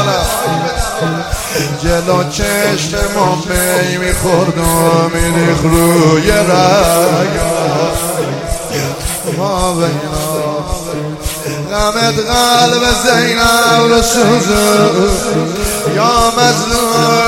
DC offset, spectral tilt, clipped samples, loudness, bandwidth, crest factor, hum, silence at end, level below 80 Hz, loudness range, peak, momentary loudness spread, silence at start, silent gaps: under 0.1%; -4 dB/octave; 0.3%; -12 LUFS; 17 kHz; 12 dB; none; 0 s; -26 dBFS; 6 LU; 0 dBFS; 9 LU; 0 s; none